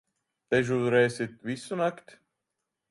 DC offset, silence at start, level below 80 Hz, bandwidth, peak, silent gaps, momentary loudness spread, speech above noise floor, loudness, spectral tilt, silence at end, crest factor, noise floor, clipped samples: under 0.1%; 0.5 s; -68 dBFS; 11.5 kHz; -10 dBFS; none; 10 LU; 57 dB; -28 LUFS; -6 dB/octave; 0.95 s; 20 dB; -85 dBFS; under 0.1%